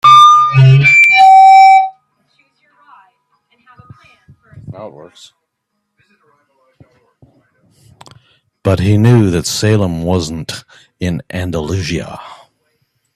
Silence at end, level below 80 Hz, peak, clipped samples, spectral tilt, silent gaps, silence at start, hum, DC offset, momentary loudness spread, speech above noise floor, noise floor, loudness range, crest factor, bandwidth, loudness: 0.85 s; -44 dBFS; 0 dBFS; 0.1%; -5.5 dB/octave; none; 0.05 s; none; under 0.1%; 22 LU; 57 dB; -71 dBFS; 13 LU; 12 dB; 13.5 kHz; -9 LUFS